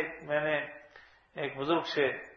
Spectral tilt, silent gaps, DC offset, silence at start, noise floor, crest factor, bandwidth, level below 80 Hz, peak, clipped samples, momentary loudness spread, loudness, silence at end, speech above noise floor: -5.5 dB/octave; none; under 0.1%; 0 s; -57 dBFS; 18 dB; 7.4 kHz; -70 dBFS; -14 dBFS; under 0.1%; 15 LU; -32 LUFS; 0 s; 26 dB